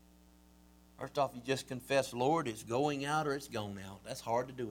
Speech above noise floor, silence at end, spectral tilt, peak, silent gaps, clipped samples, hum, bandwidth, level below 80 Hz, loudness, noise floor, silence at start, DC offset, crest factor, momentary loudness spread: 27 dB; 0 s; -5 dB/octave; -18 dBFS; none; under 0.1%; none; 18.5 kHz; -66 dBFS; -36 LUFS; -62 dBFS; 1 s; under 0.1%; 18 dB; 11 LU